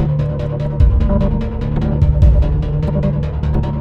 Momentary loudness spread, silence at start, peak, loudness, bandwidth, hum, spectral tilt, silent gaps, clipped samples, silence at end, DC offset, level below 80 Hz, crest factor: 7 LU; 0 s; -2 dBFS; -16 LUFS; 5.2 kHz; none; -10 dB/octave; none; under 0.1%; 0 s; under 0.1%; -16 dBFS; 12 dB